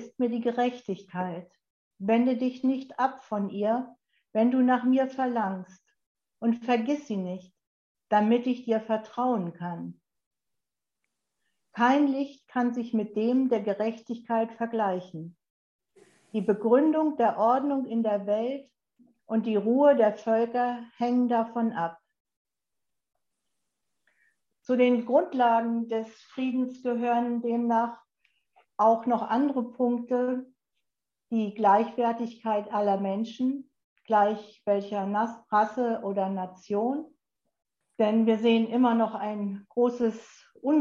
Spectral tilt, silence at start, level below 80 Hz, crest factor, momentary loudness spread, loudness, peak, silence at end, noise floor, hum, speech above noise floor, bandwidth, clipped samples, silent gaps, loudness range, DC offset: -7.5 dB/octave; 0 s; -80 dBFS; 18 dB; 11 LU; -27 LUFS; -10 dBFS; 0 s; -88 dBFS; none; 62 dB; 7 kHz; under 0.1%; 1.70-1.91 s, 6.06-6.15 s, 7.67-7.95 s, 10.26-10.31 s, 15.50-15.79 s, 22.20-22.25 s, 22.37-22.45 s, 33.84-33.96 s; 4 LU; under 0.1%